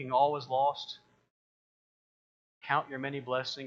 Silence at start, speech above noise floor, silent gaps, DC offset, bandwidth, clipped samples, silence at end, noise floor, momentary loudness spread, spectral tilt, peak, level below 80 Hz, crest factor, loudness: 0 s; over 58 dB; 1.30-2.61 s; under 0.1%; 7.4 kHz; under 0.1%; 0 s; under -90 dBFS; 16 LU; -5 dB/octave; -14 dBFS; -82 dBFS; 20 dB; -32 LUFS